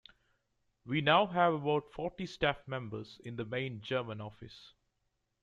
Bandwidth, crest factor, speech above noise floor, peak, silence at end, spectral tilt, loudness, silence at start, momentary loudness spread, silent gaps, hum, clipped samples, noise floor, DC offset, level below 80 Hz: 9 kHz; 22 dB; 48 dB; -14 dBFS; 0.75 s; -6.5 dB/octave; -33 LUFS; 0.85 s; 17 LU; none; none; under 0.1%; -82 dBFS; under 0.1%; -64 dBFS